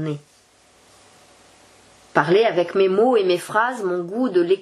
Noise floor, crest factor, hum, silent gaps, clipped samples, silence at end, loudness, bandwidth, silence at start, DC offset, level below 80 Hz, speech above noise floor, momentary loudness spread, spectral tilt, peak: -55 dBFS; 20 dB; none; none; under 0.1%; 0 s; -19 LUFS; 12.5 kHz; 0 s; under 0.1%; -72 dBFS; 36 dB; 8 LU; -6 dB/octave; 0 dBFS